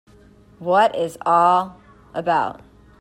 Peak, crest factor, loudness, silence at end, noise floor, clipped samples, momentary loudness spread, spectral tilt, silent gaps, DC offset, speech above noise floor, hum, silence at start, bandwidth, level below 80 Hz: -4 dBFS; 18 dB; -19 LUFS; 0.5 s; -49 dBFS; under 0.1%; 16 LU; -5.5 dB/octave; none; under 0.1%; 31 dB; none; 0.6 s; 15.5 kHz; -56 dBFS